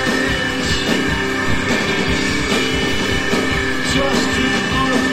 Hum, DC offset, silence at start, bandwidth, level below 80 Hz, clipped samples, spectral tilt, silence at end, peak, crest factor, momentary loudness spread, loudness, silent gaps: none; under 0.1%; 0 s; 16.5 kHz; -32 dBFS; under 0.1%; -4 dB/octave; 0 s; -2 dBFS; 14 dB; 2 LU; -17 LUFS; none